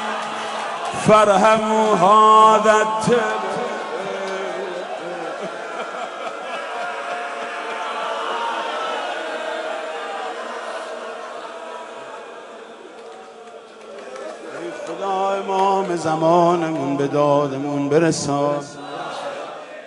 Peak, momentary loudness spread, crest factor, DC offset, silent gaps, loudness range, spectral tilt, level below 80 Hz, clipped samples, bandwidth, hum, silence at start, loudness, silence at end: -2 dBFS; 20 LU; 18 dB; under 0.1%; none; 18 LU; -4.5 dB/octave; -64 dBFS; under 0.1%; 11.5 kHz; none; 0 s; -20 LUFS; 0 s